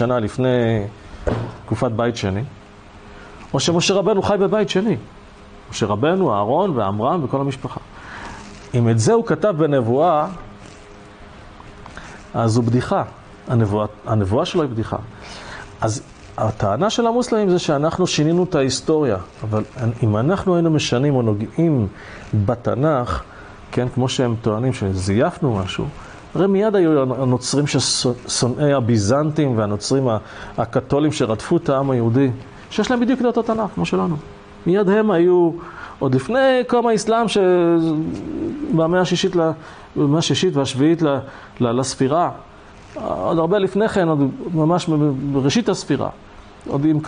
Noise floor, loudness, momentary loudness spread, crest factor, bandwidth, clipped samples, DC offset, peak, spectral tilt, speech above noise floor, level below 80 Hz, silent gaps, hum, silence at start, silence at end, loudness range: -42 dBFS; -19 LUFS; 13 LU; 12 dB; 10 kHz; under 0.1%; under 0.1%; -6 dBFS; -6 dB/octave; 24 dB; -44 dBFS; none; none; 0 s; 0 s; 4 LU